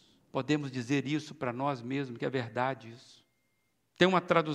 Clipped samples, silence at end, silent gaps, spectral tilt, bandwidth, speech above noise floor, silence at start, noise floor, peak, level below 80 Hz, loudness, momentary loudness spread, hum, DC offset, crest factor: under 0.1%; 0 s; none; -6 dB/octave; 11 kHz; 46 dB; 0.35 s; -77 dBFS; -8 dBFS; -76 dBFS; -32 LUFS; 11 LU; none; under 0.1%; 24 dB